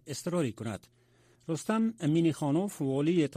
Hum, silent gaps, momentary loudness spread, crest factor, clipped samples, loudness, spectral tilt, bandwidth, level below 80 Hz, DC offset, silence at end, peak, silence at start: none; none; 12 LU; 14 dB; under 0.1%; -31 LUFS; -6.5 dB/octave; 15 kHz; -70 dBFS; under 0.1%; 0 s; -16 dBFS; 0.05 s